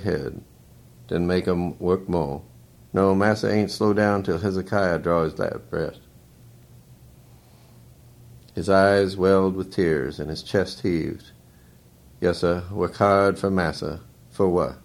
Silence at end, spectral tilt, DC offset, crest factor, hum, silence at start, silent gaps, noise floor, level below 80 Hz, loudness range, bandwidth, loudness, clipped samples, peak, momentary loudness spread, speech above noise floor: 0.05 s; -7 dB/octave; under 0.1%; 20 dB; none; 0 s; none; -52 dBFS; -48 dBFS; 5 LU; 16.5 kHz; -23 LUFS; under 0.1%; -4 dBFS; 13 LU; 30 dB